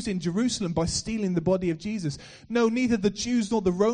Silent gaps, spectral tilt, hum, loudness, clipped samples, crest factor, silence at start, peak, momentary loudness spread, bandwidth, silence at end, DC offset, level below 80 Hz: none; -5.5 dB/octave; none; -26 LUFS; under 0.1%; 14 dB; 0 s; -12 dBFS; 7 LU; 10 kHz; 0 s; under 0.1%; -48 dBFS